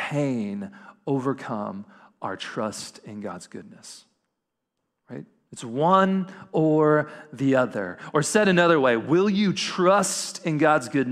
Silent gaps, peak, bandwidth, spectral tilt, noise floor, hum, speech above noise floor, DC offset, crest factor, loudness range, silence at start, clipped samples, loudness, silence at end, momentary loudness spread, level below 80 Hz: none; -6 dBFS; 15 kHz; -5 dB/octave; -81 dBFS; none; 57 dB; under 0.1%; 18 dB; 15 LU; 0 s; under 0.1%; -23 LUFS; 0 s; 22 LU; -68 dBFS